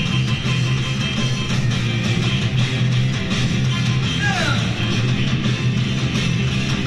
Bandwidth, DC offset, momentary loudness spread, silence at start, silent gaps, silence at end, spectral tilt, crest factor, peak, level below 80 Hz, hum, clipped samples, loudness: 11 kHz; under 0.1%; 2 LU; 0 s; none; 0 s; -5 dB/octave; 14 dB; -6 dBFS; -36 dBFS; none; under 0.1%; -19 LUFS